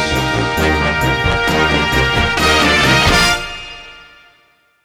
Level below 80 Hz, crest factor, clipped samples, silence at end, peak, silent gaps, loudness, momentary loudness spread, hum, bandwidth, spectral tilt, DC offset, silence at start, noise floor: -26 dBFS; 14 dB; under 0.1%; 0.8 s; 0 dBFS; none; -13 LUFS; 11 LU; none; 19.5 kHz; -4 dB/octave; under 0.1%; 0 s; -54 dBFS